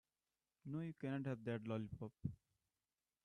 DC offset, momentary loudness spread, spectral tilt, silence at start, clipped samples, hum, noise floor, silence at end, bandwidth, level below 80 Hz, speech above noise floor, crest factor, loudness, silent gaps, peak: under 0.1%; 7 LU; -9 dB/octave; 0.65 s; under 0.1%; none; under -90 dBFS; 0.9 s; 10 kHz; -76 dBFS; over 44 dB; 20 dB; -48 LUFS; none; -30 dBFS